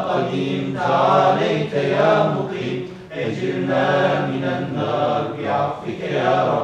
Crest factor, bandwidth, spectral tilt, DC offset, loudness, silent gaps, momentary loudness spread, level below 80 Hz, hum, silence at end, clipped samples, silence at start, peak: 14 dB; 9.4 kHz; -7 dB/octave; under 0.1%; -20 LUFS; none; 9 LU; -58 dBFS; none; 0 s; under 0.1%; 0 s; -4 dBFS